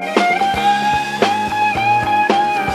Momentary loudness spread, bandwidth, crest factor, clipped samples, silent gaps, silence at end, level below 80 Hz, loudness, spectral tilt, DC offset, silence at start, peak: 2 LU; 15 kHz; 16 dB; under 0.1%; none; 0 s; -44 dBFS; -15 LUFS; -4 dB/octave; under 0.1%; 0 s; 0 dBFS